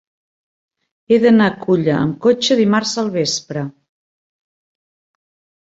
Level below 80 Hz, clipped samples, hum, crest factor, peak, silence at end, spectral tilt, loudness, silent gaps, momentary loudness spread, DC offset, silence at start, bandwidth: -58 dBFS; under 0.1%; none; 18 dB; 0 dBFS; 1.9 s; -5 dB/octave; -15 LUFS; none; 10 LU; under 0.1%; 1.1 s; 8 kHz